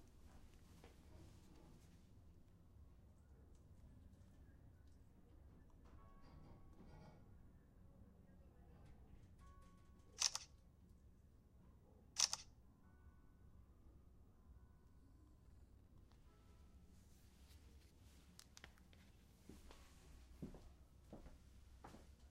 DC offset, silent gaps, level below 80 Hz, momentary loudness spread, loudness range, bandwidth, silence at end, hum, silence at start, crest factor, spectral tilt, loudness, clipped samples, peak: under 0.1%; none; -68 dBFS; 16 LU; 21 LU; 15.5 kHz; 0 s; none; 0 s; 38 dB; -1 dB/octave; -47 LUFS; under 0.1%; -20 dBFS